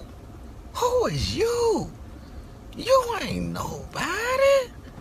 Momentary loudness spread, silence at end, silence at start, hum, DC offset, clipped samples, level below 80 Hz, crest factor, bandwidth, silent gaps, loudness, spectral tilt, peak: 23 LU; 0 s; 0 s; none; under 0.1%; under 0.1%; -42 dBFS; 18 dB; 14.5 kHz; none; -24 LUFS; -4.5 dB/octave; -8 dBFS